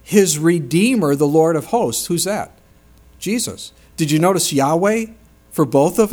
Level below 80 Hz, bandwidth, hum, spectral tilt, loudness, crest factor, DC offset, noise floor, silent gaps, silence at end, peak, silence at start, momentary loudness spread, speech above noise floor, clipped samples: -50 dBFS; over 20 kHz; none; -5 dB/octave; -17 LUFS; 16 dB; under 0.1%; -49 dBFS; none; 0 s; 0 dBFS; 0.1 s; 13 LU; 32 dB; under 0.1%